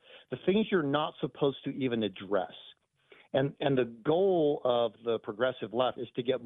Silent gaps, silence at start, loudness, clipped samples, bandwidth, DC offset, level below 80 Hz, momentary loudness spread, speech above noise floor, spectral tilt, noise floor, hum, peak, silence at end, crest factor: none; 0.15 s; -31 LUFS; under 0.1%; 4 kHz; under 0.1%; -70 dBFS; 7 LU; 31 dB; -9.5 dB/octave; -61 dBFS; none; -14 dBFS; 0 s; 18 dB